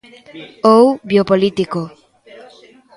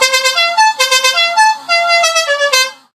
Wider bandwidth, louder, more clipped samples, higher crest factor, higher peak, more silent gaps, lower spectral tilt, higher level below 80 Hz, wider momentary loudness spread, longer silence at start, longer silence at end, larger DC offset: second, 11.5 kHz vs 16 kHz; second, -14 LUFS vs -10 LUFS; neither; about the same, 16 dB vs 12 dB; about the same, 0 dBFS vs 0 dBFS; neither; first, -7 dB/octave vs 4 dB/octave; first, -56 dBFS vs -70 dBFS; first, 22 LU vs 3 LU; first, 0.35 s vs 0 s; first, 1.1 s vs 0.2 s; neither